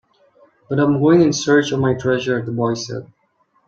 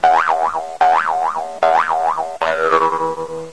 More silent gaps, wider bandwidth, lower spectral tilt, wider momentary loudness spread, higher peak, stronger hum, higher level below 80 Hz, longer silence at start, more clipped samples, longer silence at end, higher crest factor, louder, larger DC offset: neither; second, 7.8 kHz vs 11 kHz; first, -6 dB/octave vs -3.5 dB/octave; first, 11 LU vs 7 LU; about the same, -2 dBFS vs -2 dBFS; neither; about the same, -54 dBFS vs -56 dBFS; first, 0.7 s vs 0 s; neither; first, 0.6 s vs 0 s; about the same, 16 dB vs 16 dB; about the same, -17 LUFS vs -17 LUFS; second, under 0.1% vs 0.7%